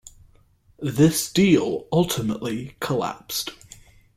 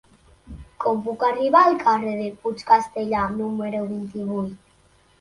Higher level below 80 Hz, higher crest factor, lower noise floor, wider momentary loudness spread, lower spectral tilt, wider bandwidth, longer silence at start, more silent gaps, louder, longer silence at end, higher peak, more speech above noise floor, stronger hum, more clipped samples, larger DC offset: about the same, -52 dBFS vs -52 dBFS; about the same, 18 dB vs 20 dB; about the same, -57 dBFS vs -58 dBFS; about the same, 12 LU vs 13 LU; second, -5 dB/octave vs -6.5 dB/octave; first, 16 kHz vs 11.5 kHz; first, 0.8 s vs 0.5 s; neither; about the same, -22 LUFS vs -22 LUFS; about the same, 0.6 s vs 0.65 s; about the same, -6 dBFS vs -4 dBFS; about the same, 35 dB vs 36 dB; neither; neither; neither